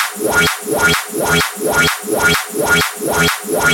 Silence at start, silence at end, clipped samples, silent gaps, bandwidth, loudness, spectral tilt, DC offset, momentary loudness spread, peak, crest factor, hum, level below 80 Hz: 0 s; 0 s; under 0.1%; none; 19 kHz; -14 LUFS; -2.5 dB/octave; under 0.1%; 2 LU; -2 dBFS; 14 dB; none; -38 dBFS